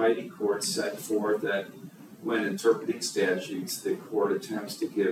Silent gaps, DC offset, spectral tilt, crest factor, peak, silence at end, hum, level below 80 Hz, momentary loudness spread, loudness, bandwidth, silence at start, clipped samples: none; under 0.1%; -4 dB/octave; 18 dB; -12 dBFS; 0 s; none; -80 dBFS; 8 LU; -29 LUFS; 16.5 kHz; 0 s; under 0.1%